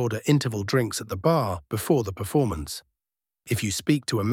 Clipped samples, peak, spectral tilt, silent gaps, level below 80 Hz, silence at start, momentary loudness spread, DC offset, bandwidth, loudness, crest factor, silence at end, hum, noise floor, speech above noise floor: under 0.1%; -8 dBFS; -5.5 dB/octave; none; -50 dBFS; 0 s; 7 LU; under 0.1%; 17 kHz; -25 LUFS; 18 dB; 0 s; none; under -90 dBFS; over 65 dB